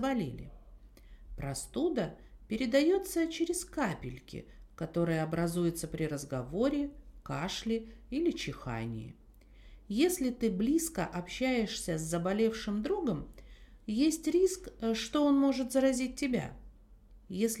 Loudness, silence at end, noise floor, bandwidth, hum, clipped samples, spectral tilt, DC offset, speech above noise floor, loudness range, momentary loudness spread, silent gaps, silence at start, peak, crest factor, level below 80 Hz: -33 LUFS; 0 s; -57 dBFS; 16.5 kHz; none; under 0.1%; -5 dB/octave; under 0.1%; 24 dB; 5 LU; 14 LU; none; 0 s; -16 dBFS; 18 dB; -54 dBFS